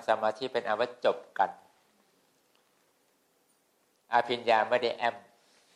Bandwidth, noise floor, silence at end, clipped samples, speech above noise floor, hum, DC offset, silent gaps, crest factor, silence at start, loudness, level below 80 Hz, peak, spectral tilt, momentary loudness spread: 12 kHz; -71 dBFS; 0.55 s; under 0.1%; 42 dB; none; under 0.1%; none; 20 dB; 0 s; -30 LUFS; -84 dBFS; -12 dBFS; -4 dB/octave; 7 LU